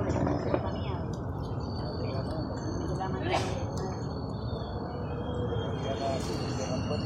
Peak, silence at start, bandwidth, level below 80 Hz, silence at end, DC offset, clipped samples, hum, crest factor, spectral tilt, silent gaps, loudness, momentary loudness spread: -10 dBFS; 0 s; 12 kHz; -44 dBFS; 0 s; under 0.1%; under 0.1%; none; 22 dB; -6.5 dB/octave; none; -33 LUFS; 5 LU